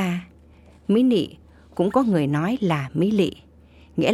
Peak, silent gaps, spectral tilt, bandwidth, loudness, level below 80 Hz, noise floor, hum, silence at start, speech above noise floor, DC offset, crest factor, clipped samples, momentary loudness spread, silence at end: -6 dBFS; none; -7.5 dB/octave; 13.5 kHz; -22 LUFS; -54 dBFS; -50 dBFS; none; 0 s; 30 dB; under 0.1%; 16 dB; under 0.1%; 13 LU; 0 s